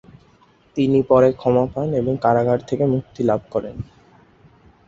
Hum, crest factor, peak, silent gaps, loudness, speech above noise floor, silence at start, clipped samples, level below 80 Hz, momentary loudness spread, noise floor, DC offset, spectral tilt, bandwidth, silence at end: none; 18 dB; -2 dBFS; none; -19 LUFS; 36 dB; 0.75 s; under 0.1%; -50 dBFS; 14 LU; -54 dBFS; under 0.1%; -9 dB/octave; 7.6 kHz; 1.05 s